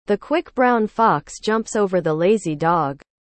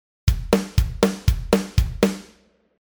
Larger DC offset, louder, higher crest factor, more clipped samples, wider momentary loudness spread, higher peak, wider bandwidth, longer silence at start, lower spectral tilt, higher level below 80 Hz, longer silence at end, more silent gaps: neither; first, -19 LUFS vs -22 LUFS; about the same, 16 dB vs 20 dB; neither; about the same, 5 LU vs 4 LU; about the same, -4 dBFS vs -2 dBFS; second, 8.8 kHz vs over 20 kHz; second, 0.1 s vs 0.25 s; about the same, -5.5 dB/octave vs -6 dB/octave; second, -54 dBFS vs -26 dBFS; second, 0.4 s vs 0.55 s; neither